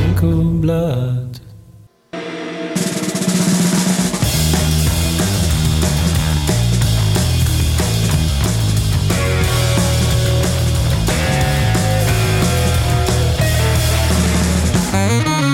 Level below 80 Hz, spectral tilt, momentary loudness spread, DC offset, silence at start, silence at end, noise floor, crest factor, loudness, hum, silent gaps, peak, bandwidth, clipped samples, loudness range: -24 dBFS; -5 dB/octave; 4 LU; under 0.1%; 0 s; 0 s; -44 dBFS; 12 dB; -16 LUFS; none; none; -4 dBFS; 17 kHz; under 0.1%; 4 LU